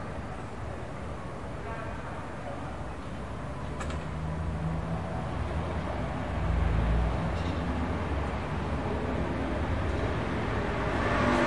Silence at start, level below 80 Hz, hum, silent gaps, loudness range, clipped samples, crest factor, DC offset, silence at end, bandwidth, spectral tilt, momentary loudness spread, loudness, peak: 0 s; -38 dBFS; none; none; 7 LU; under 0.1%; 18 dB; 0.6%; 0 s; 11 kHz; -7 dB/octave; 10 LU; -33 LUFS; -12 dBFS